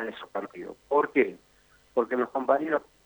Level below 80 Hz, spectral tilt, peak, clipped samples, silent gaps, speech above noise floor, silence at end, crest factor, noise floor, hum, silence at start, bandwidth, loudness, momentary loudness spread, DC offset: -70 dBFS; -6.5 dB/octave; -8 dBFS; under 0.1%; none; 34 dB; 0.25 s; 20 dB; -61 dBFS; none; 0 s; over 20 kHz; -28 LUFS; 12 LU; under 0.1%